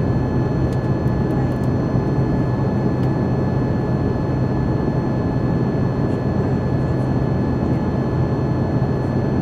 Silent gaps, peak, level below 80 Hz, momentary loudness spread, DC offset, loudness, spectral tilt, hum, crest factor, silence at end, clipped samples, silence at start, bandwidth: none; -6 dBFS; -32 dBFS; 1 LU; under 0.1%; -20 LUFS; -9.5 dB/octave; none; 14 dB; 0 s; under 0.1%; 0 s; 6.4 kHz